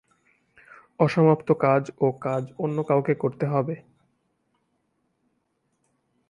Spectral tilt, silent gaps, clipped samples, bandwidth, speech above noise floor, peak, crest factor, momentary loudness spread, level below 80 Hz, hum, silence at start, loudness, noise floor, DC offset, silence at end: -9 dB/octave; none; under 0.1%; 10.5 kHz; 50 dB; -6 dBFS; 20 dB; 9 LU; -68 dBFS; none; 1 s; -24 LUFS; -73 dBFS; under 0.1%; 2.5 s